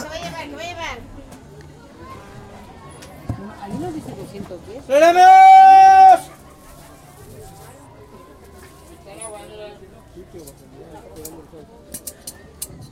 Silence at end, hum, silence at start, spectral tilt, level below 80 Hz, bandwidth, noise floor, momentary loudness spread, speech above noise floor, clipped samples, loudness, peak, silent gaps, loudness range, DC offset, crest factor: 0.6 s; none; 0 s; -4 dB/octave; -48 dBFS; 16 kHz; -43 dBFS; 30 LU; 28 dB; under 0.1%; -8 LUFS; -2 dBFS; none; 23 LU; under 0.1%; 16 dB